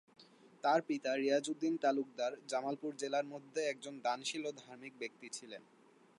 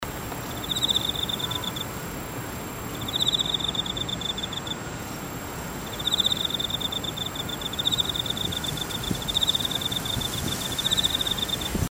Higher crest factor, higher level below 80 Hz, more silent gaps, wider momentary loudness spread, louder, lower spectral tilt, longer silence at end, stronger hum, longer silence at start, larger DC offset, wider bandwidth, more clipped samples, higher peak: about the same, 18 dB vs 18 dB; second, under -90 dBFS vs -44 dBFS; neither; about the same, 13 LU vs 11 LU; second, -38 LUFS vs -26 LUFS; about the same, -3.5 dB/octave vs -2.5 dB/octave; first, 0.6 s vs 0 s; neither; first, 0.2 s vs 0 s; neither; second, 11.5 kHz vs 16.5 kHz; neither; second, -20 dBFS vs -10 dBFS